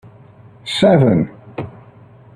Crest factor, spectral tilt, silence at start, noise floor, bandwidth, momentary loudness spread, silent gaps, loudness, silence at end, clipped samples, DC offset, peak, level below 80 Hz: 16 dB; -7 dB/octave; 0.65 s; -43 dBFS; 11 kHz; 21 LU; none; -15 LUFS; 0.65 s; under 0.1%; under 0.1%; -2 dBFS; -50 dBFS